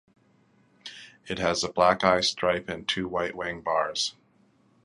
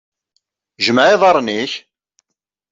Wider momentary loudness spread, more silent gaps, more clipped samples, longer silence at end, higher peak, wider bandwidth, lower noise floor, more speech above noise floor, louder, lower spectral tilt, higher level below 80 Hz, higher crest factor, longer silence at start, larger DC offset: first, 21 LU vs 13 LU; neither; neither; second, 0.75 s vs 0.95 s; second, -6 dBFS vs -2 dBFS; first, 11 kHz vs 7.8 kHz; second, -63 dBFS vs -79 dBFS; second, 37 dB vs 66 dB; second, -26 LUFS vs -14 LUFS; about the same, -3 dB/octave vs -4 dB/octave; first, -56 dBFS vs -64 dBFS; first, 22 dB vs 14 dB; about the same, 0.85 s vs 0.8 s; neither